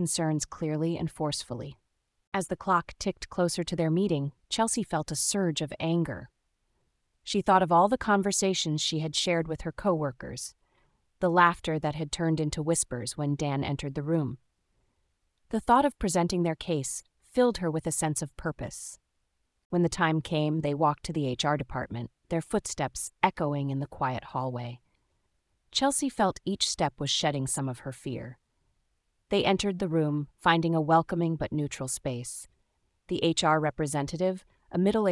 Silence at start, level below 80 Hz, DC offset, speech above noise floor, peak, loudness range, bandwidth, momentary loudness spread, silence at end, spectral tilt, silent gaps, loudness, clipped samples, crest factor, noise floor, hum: 0 s; -54 dBFS; under 0.1%; 48 dB; -6 dBFS; 4 LU; 12 kHz; 11 LU; 0 s; -4.5 dB/octave; 2.27-2.32 s, 19.65-19.70 s; -29 LUFS; under 0.1%; 24 dB; -76 dBFS; none